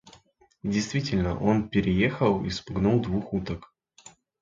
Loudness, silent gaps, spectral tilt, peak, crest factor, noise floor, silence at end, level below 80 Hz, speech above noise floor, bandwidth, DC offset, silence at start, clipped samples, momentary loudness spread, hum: -26 LUFS; none; -6.5 dB/octave; -8 dBFS; 18 dB; -60 dBFS; 0.3 s; -46 dBFS; 35 dB; 7.6 kHz; under 0.1%; 0.05 s; under 0.1%; 8 LU; none